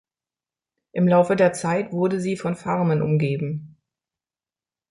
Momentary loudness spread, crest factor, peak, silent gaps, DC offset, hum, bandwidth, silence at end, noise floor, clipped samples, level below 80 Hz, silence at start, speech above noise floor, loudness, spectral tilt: 10 LU; 18 dB; -4 dBFS; none; under 0.1%; none; 11.5 kHz; 1.25 s; under -90 dBFS; under 0.1%; -62 dBFS; 0.95 s; over 69 dB; -22 LUFS; -7.5 dB/octave